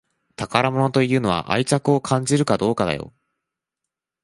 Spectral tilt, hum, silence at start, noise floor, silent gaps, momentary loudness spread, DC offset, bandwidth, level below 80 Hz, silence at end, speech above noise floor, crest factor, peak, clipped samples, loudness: -5.5 dB/octave; none; 0.4 s; -85 dBFS; none; 6 LU; under 0.1%; 11.5 kHz; -52 dBFS; 1.15 s; 65 dB; 20 dB; -2 dBFS; under 0.1%; -20 LUFS